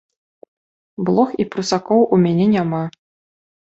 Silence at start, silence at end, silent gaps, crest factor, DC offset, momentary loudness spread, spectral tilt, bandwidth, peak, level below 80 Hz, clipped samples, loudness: 1 s; 0.75 s; none; 18 dB; under 0.1%; 10 LU; -7 dB/octave; 8 kHz; -2 dBFS; -58 dBFS; under 0.1%; -17 LUFS